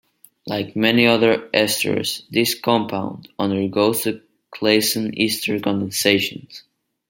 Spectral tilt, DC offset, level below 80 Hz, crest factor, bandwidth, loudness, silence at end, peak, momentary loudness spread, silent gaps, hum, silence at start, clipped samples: -3.5 dB/octave; under 0.1%; -62 dBFS; 20 dB; 16.5 kHz; -19 LUFS; 0.5 s; 0 dBFS; 11 LU; none; none; 0.45 s; under 0.1%